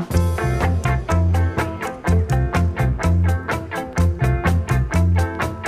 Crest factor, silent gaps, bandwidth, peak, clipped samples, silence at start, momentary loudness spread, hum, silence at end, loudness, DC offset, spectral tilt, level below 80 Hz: 14 dB; none; 14.5 kHz; -4 dBFS; under 0.1%; 0 s; 5 LU; none; 0 s; -20 LUFS; under 0.1%; -7 dB/octave; -26 dBFS